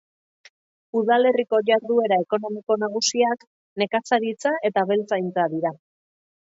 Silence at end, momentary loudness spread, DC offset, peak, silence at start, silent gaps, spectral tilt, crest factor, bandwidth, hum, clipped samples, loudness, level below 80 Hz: 0.7 s; 8 LU; under 0.1%; -6 dBFS; 0.95 s; 3.47-3.76 s; -3.5 dB/octave; 16 dB; 7.8 kHz; none; under 0.1%; -22 LUFS; -76 dBFS